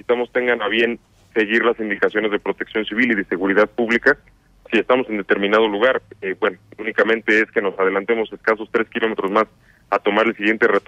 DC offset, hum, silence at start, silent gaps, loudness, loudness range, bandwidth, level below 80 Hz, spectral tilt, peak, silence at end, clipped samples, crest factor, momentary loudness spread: under 0.1%; none; 0.1 s; none; -19 LUFS; 1 LU; 8.2 kHz; -58 dBFS; -5.5 dB/octave; -2 dBFS; 0.1 s; under 0.1%; 16 dB; 7 LU